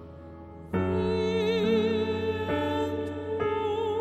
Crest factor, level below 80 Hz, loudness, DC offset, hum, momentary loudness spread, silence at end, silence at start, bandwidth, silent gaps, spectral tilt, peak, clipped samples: 14 dB; -54 dBFS; -28 LUFS; under 0.1%; none; 13 LU; 0 s; 0 s; 12.5 kHz; none; -7 dB/octave; -14 dBFS; under 0.1%